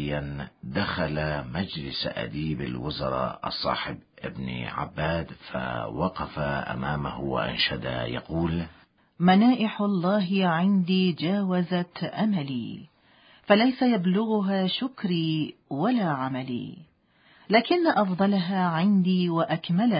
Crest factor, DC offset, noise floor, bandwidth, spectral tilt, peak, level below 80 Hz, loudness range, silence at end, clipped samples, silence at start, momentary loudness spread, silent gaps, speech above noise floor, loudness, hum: 20 dB; under 0.1%; -60 dBFS; 5.2 kHz; -11 dB/octave; -6 dBFS; -50 dBFS; 7 LU; 0 s; under 0.1%; 0 s; 11 LU; none; 35 dB; -26 LUFS; none